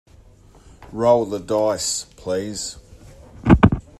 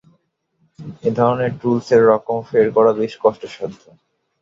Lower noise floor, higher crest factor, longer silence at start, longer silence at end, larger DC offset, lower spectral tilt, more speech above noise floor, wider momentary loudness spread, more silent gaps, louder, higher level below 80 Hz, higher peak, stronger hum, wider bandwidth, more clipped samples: second, -48 dBFS vs -64 dBFS; about the same, 20 dB vs 16 dB; about the same, 0.9 s vs 0.8 s; second, 0.2 s vs 0.65 s; neither; second, -5.5 dB/octave vs -7.5 dB/octave; second, 27 dB vs 48 dB; about the same, 14 LU vs 16 LU; neither; second, -20 LUFS vs -17 LUFS; first, -34 dBFS vs -58 dBFS; about the same, 0 dBFS vs -2 dBFS; neither; first, 13.5 kHz vs 7.4 kHz; neither